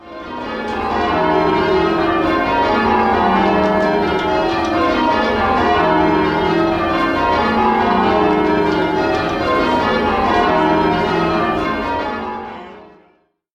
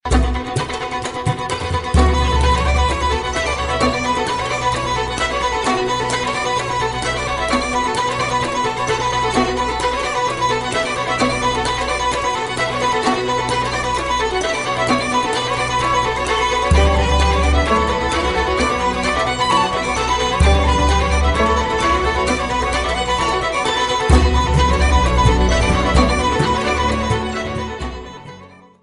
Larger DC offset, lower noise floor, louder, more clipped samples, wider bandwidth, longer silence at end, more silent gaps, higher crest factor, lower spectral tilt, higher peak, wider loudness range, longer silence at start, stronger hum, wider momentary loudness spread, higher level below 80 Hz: neither; first, -57 dBFS vs -41 dBFS; about the same, -15 LUFS vs -17 LUFS; neither; about the same, 10 kHz vs 11 kHz; first, 0.65 s vs 0.35 s; neither; about the same, 14 dB vs 16 dB; first, -6.5 dB/octave vs -4.5 dB/octave; about the same, -2 dBFS vs 0 dBFS; about the same, 2 LU vs 3 LU; about the same, 0 s vs 0.05 s; neither; about the same, 7 LU vs 5 LU; second, -36 dBFS vs -22 dBFS